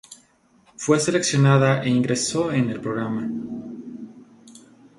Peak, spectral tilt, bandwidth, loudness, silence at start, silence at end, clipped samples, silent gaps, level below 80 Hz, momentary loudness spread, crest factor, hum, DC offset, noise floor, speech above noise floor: -2 dBFS; -5.5 dB/octave; 11.5 kHz; -21 LUFS; 0.1 s; 0.4 s; under 0.1%; none; -60 dBFS; 19 LU; 20 dB; none; under 0.1%; -58 dBFS; 38 dB